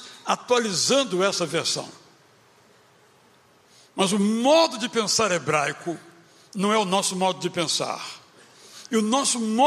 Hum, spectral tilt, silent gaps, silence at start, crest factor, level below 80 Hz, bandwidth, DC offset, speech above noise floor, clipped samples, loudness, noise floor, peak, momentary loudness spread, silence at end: none; -3 dB/octave; none; 0 s; 20 dB; -72 dBFS; 15.5 kHz; under 0.1%; 34 dB; under 0.1%; -23 LUFS; -57 dBFS; -6 dBFS; 14 LU; 0 s